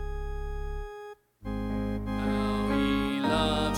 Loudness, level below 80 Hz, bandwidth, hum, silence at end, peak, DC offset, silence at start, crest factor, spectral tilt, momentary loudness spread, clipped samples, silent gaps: -30 LUFS; -38 dBFS; 16 kHz; none; 0 s; -14 dBFS; under 0.1%; 0 s; 16 dB; -6 dB/octave; 15 LU; under 0.1%; none